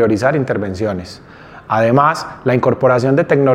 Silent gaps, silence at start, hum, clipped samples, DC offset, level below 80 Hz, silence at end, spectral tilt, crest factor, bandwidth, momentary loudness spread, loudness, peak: none; 0 s; none; under 0.1%; under 0.1%; -52 dBFS; 0 s; -7.5 dB/octave; 14 dB; 13 kHz; 9 LU; -15 LUFS; 0 dBFS